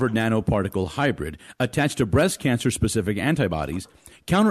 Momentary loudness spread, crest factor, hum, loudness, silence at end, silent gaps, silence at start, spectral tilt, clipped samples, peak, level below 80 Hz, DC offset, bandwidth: 11 LU; 14 dB; none; -23 LUFS; 0 s; none; 0 s; -5.5 dB/octave; under 0.1%; -10 dBFS; -40 dBFS; under 0.1%; 14 kHz